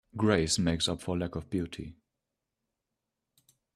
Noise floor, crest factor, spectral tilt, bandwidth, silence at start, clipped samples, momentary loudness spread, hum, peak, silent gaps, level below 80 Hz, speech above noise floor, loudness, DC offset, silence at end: -87 dBFS; 22 dB; -4.5 dB/octave; 13.5 kHz; 0.15 s; under 0.1%; 14 LU; none; -10 dBFS; none; -56 dBFS; 56 dB; -30 LUFS; under 0.1%; 1.85 s